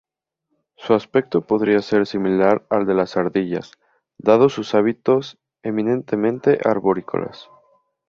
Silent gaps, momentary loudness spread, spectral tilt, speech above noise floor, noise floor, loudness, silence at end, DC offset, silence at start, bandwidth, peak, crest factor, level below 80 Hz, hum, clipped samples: none; 10 LU; -7.5 dB/octave; 57 dB; -76 dBFS; -19 LUFS; 0.65 s; under 0.1%; 0.8 s; 7 kHz; -2 dBFS; 18 dB; -60 dBFS; none; under 0.1%